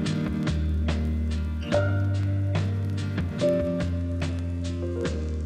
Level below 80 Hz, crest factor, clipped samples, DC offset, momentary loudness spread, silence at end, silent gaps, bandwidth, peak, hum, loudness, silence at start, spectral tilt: -34 dBFS; 16 dB; under 0.1%; under 0.1%; 5 LU; 0 s; none; 9.6 kHz; -10 dBFS; none; -27 LUFS; 0 s; -7.5 dB/octave